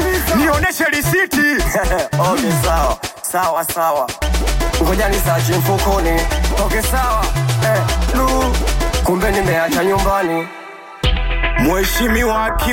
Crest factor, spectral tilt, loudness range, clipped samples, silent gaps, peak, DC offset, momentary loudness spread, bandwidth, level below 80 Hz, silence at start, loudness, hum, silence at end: 10 dB; -4.5 dB/octave; 1 LU; under 0.1%; none; -4 dBFS; under 0.1%; 4 LU; 17 kHz; -22 dBFS; 0 s; -16 LUFS; none; 0 s